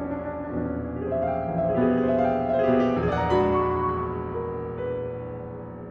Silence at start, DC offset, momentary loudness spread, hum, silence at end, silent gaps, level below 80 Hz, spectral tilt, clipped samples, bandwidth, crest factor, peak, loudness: 0 s; under 0.1%; 10 LU; none; 0 s; none; -48 dBFS; -9 dB/octave; under 0.1%; 6.6 kHz; 14 dB; -10 dBFS; -25 LUFS